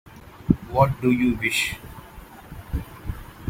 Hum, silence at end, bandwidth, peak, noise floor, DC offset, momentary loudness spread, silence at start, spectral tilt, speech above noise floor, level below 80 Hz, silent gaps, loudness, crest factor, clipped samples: none; 0 s; 16.5 kHz; -2 dBFS; -43 dBFS; under 0.1%; 22 LU; 0.15 s; -5.5 dB/octave; 22 dB; -40 dBFS; none; -23 LUFS; 22 dB; under 0.1%